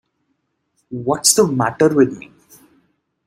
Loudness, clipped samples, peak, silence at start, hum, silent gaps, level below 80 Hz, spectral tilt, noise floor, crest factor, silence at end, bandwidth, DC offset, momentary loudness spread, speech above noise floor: -15 LUFS; under 0.1%; 0 dBFS; 0.9 s; none; none; -60 dBFS; -3.5 dB/octave; -70 dBFS; 20 dB; 1.05 s; 16 kHz; under 0.1%; 17 LU; 54 dB